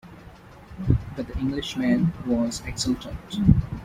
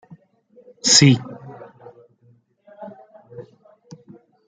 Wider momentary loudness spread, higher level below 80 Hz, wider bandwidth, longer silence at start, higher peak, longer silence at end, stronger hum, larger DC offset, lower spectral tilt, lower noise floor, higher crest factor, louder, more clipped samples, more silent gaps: second, 13 LU vs 30 LU; first, -36 dBFS vs -62 dBFS; first, 15.5 kHz vs 9.6 kHz; second, 0.05 s vs 0.85 s; about the same, -2 dBFS vs -2 dBFS; second, 0 s vs 1.05 s; neither; neither; first, -6 dB/octave vs -3.5 dB/octave; second, -46 dBFS vs -58 dBFS; about the same, 22 dB vs 22 dB; second, -25 LUFS vs -14 LUFS; neither; neither